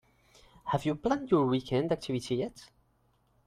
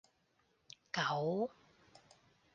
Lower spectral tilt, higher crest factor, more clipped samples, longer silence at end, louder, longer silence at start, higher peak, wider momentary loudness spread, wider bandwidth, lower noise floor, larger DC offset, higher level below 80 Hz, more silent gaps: first, -7 dB/octave vs -5 dB/octave; about the same, 20 dB vs 18 dB; neither; second, 0.8 s vs 1.05 s; first, -31 LUFS vs -38 LUFS; second, 0.65 s vs 0.95 s; first, -12 dBFS vs -24 dBFS; second, 7 LU vs 23 LU; first, 14.5 kHz vs 9.4 kHz; second, -70 dBFS vs -77 dBFS; neither; first, -60 dBFS vs -82 dBFS; neither